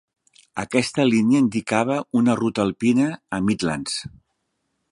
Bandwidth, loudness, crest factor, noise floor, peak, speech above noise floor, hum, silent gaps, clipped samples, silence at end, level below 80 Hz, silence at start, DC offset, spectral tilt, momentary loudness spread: 11 kHz; -21 LUFS; 18 dB; -74 dBFS; -2 dBFS; 54 dB; none; none; under 0.1%; 0.85 s; -56 dBFS; 0.55 s; under 0.1%; -5.5 dB/octave; 10 LU